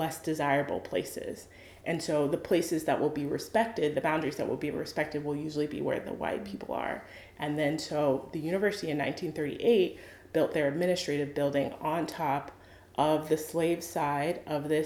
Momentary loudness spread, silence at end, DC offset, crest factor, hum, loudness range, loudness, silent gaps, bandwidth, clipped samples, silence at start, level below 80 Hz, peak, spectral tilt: 8 LU; 0 s; under 0.1%; 18 dB; none; 3 LU; -31 LUFS; none; 19 kHz; under 0.1%; 0 s; -62 dBFS; -12 dBFS; -5.5 dB/octave